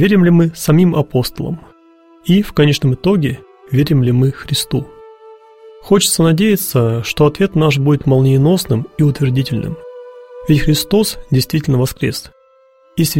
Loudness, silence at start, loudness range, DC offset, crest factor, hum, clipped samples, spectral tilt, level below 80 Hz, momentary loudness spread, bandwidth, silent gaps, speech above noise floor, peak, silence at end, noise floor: -14 LUFS; 0 s; 3 LU; 0.4%; 14 dB; none; under 0.1%; -6 dB/octave; -38 dBFS; 14 LU; 16.5 kHz; none; 37 dB; 0 dBFS; 0 s; -50 dBFS